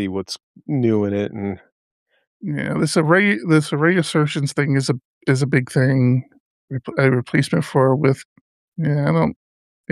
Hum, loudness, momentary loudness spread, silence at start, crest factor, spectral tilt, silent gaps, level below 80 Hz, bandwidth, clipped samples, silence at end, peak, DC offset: none; -19 LUFS; 12 LU; 0 s; 18 dB; -6.5 dB/octave; 0.43-0.54 s, 1.72-2.06 s, 2.27-2.40 s, 5.05-5.21 s, 6.40-6.68 s, 8.25-8.72 s; -60 dBFS; 12.5 kHz; under 0.1%; 0.6 s; -2 dBFS; under 0.1%